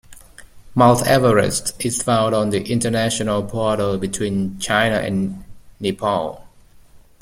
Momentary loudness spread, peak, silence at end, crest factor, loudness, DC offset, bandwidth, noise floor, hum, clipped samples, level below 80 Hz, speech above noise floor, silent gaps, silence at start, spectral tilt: 10 LU; -2 dBFS; 0.25 s; 18 dB; -19 LUFS; under 0.1%; 16.5 kHz; -46 dBFS; none; under 0.1%; -44 dBFS; 28 dB; none; 0.1 s; -4.5 dB/octave